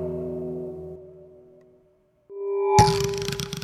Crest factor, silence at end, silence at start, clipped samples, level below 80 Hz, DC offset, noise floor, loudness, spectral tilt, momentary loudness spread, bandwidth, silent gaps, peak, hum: 24 dB; 0 s; 0 s; under 0.1%; -44 dBFS; under 0.1%; -62 dBFS; -24 LUFS; -5 dB/octave; 22 LU; 16 kHz; none; -2 dBFS; none